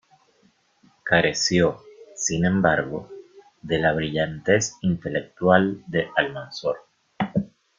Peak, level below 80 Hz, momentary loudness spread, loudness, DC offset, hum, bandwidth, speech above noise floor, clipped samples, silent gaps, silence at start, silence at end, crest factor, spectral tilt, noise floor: -2 dBFS; -54 dBFS; 14 LU; -23 LUFS; under 0.1%; none; 9.4 kHz; 40 dB; under 0.1%; none; 1.05 s; 0.35 s; 22 dB; -4.5 dB/octave; -62 dBFS